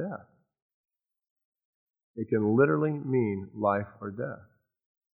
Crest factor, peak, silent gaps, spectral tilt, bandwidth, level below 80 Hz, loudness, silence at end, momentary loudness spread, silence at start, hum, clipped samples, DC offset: 22 dB; -10 dBFS; 0.62-0.84 s, 1.30-1.36 s, 1.45-1.52 s, 1.65-1.94 s, 2.03-2.14 s; -13 dB/octave; 3.9 kHz; -72 dBFS; -28 LUFS; 0.8 s; 17 LU; 0 s; none; under 0.1%; under 0.1%